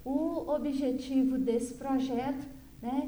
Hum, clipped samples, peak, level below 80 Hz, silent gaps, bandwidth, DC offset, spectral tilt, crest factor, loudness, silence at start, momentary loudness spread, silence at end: none; under 0.1%; -18 dBFS; -56 dBFS; none; over 20 kHz; under 0.1%; -6 dB/octave; 12 dB; -32 LUFS; 0 s; 9 LU; 0 s